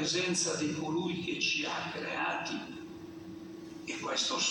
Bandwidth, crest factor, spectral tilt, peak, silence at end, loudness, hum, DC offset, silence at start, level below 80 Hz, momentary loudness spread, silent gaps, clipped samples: 17 kHz; 16 dB; -2.5 dB/octave; -18 dBFS; 0 s; -33 LUFS; none; under 0.1%; 0 s; -72 dBFS; 16 LU; none; under 0.1%